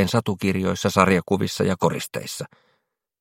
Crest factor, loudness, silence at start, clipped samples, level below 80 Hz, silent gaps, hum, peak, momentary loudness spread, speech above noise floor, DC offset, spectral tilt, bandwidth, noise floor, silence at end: 22 dB; -22 LUFS; 0 s; under 0.1%; -56 dBFS; none; none; 0 dBFS; 13 LU; 50 dB; under 0.1%; -5.5 dB/octave; 16.5 kHz; -72 dBFS; 0.75 s